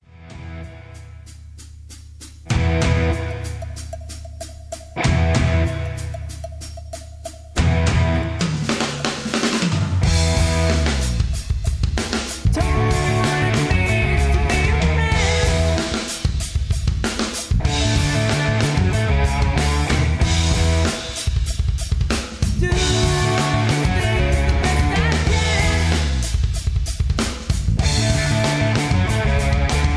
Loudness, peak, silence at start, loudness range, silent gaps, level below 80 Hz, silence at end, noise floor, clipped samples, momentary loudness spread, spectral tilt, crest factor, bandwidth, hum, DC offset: -19 LUFS; 0 dBFS; 0.15 s; 5 LU; none; -24 dBFS; 0 s; -39 dBFS; under 0.1%; 16 LU; -5 dB/octave; 18 dB; 11 kHz; none; under 0.1%